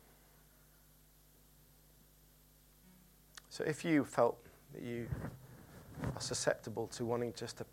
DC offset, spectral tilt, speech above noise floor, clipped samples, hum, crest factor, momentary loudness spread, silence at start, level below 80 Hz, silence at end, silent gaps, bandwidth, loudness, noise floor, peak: under 0.1%; -5 dB/octave; 28 dB; under 0.1%; 50 Hz at -70 dBFS; 24 dB; 22 LU; 2.85 s; -64 dBFS; 0.05 s; none; 16.5 kHz; -38 LUFS; -65 dBFS; -16 dBFS